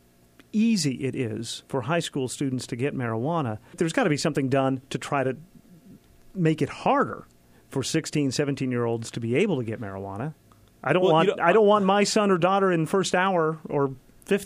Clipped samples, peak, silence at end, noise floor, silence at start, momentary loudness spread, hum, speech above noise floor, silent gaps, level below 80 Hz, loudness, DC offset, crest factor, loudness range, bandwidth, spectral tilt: under 0.1%; -6 dBFS; 0 s; -57 dBFS; 0.55 s; 13 LU; none; 32 dB; none; -62 dBFS; -25 LUFS; under 0.1%; 18 dB; 6 LU; 15.5 kHz; -5.5 dB/octave